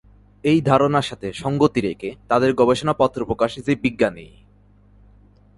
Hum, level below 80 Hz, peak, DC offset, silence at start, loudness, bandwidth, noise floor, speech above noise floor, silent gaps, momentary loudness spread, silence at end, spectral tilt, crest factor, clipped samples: 50 Hz at -50 dBFS; -48 dBFS; -2 dBFS; under 0.1%; 0.45 s; -20 LUFS; 11.5 kHz; -52 dBFS; 33 dB; none; 9 LU; 1.3 s; -6.5 dB/octave; 20 dB; under 0.1%